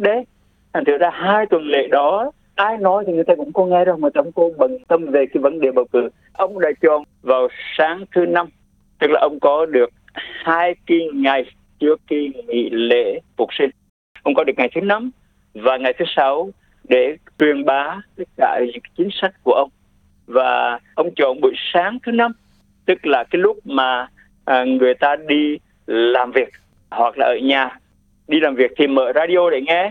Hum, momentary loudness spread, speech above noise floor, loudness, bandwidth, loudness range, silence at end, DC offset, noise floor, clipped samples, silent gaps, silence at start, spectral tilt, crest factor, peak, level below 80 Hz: none; 8 LU; 39 dB; -18 LUFS; 4.5 kHz; 3 LU; 0 s; under 0.1%; -56 dBFS; under 0.1%; 13.89-14.15 s; 0 s; -7 dB/octave; 16 dB; -2 dBFS; -60 dBFS